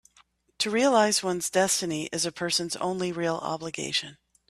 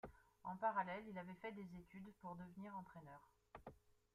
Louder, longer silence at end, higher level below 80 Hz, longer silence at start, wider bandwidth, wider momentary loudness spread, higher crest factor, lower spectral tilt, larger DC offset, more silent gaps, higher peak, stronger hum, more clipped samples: first, -26 LUFS vs -50 LUFS; about the same, 0.35 s vs 0.4 s; first, -66 dBFS vs -76 dBFS; first, 0.6 s vs 0.05 s; about the same, 15 kHz vs 15 kHz; second, 9 LU vs 19 LU; about the same, 20 dB vs 24 dB; second, -2.5 dB/octave vs -7.5 dB/octave; neither; neither; first, -8 dBFS vs -28 dBFS; neither; neither